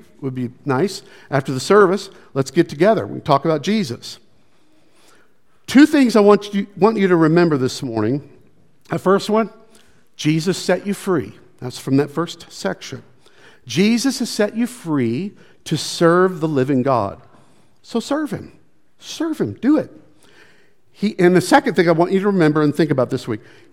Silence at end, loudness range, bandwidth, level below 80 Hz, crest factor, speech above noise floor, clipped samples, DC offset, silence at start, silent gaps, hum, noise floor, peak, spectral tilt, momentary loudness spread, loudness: 0.35 s; 7 LU; 16 kHz; -62 dBFS; 18 dB; 42 dB; under 0.1%; 0.4%; 0.2 s; none; none; -59 dBFS; 0 dBFS; -6 dB/octave; 14 LU; -18 LUFS